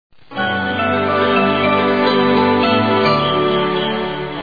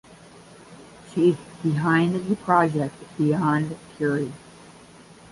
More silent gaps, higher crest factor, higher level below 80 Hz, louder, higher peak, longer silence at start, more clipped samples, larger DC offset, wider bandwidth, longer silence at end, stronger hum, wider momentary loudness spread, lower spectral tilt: neither; second, 14 dB vs 20 dB; first, -50 dBFS vs -60 dBFS; first, -15 LUFS vs -23 LUFS; first, -2 dBFS vs -6 dBFS; second, 0.3 s vs 0.7 s; neither; first, 0.7% vs under 0.1%; second, 5 kHz vs 11.5 kHz; second, 0 s vs 0.2 s; neither; second, 6 LU vs 12 LU; about the same, -7.5 dB/octave vs -7.5 dB/octave